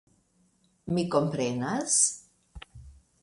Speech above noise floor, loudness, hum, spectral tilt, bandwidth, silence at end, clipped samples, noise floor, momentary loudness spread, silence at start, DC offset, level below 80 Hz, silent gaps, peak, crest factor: 41 dB; -26 LUFS; none; -3.5 dB/octave; 11.5 kHz; 0.3 s; under 0.1%; -68 dBFS; 25 LU; 0.85 s; under 0.1%; -56 dBFS; none; -10 dBFS; 22 dB